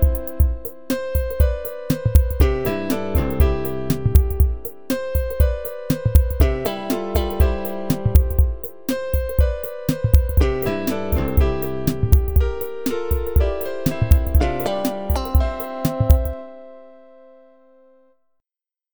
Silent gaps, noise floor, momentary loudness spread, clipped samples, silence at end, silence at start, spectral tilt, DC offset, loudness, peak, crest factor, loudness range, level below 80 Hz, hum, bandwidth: none; under -90 dBFS; 8 LU; under 0.1%; 0 s; 0 s; -7 dB/octave; 2%; -21 LUFS; 0 dBFS; 20 dB; 2 LU; -22 dBFS; none; over 20 kHz